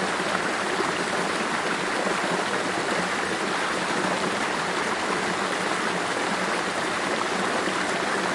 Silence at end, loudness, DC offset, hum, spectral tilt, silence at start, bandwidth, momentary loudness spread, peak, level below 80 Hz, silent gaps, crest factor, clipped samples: 0 s; -25 LUFS; under 0.1%; none; -3 dB/octave; 0 s; 11.5 kHz; 1 LU; -8 dBFS; -62 dBFS; none; 18 dB; under 0.1%